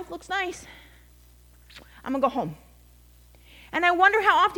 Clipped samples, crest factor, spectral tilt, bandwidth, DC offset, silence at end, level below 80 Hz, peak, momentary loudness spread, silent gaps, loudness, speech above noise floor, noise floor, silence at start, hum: under 0.1%; 22 dB; -4 dB/octave; 19 kHz; under 0.1%; 0 s; -54 dBFS; -6 dBFS; 17 LU; none; -23 LUFS; 29 dB; -53 dBFS; 0 s; 60 Hz at -55 dBFS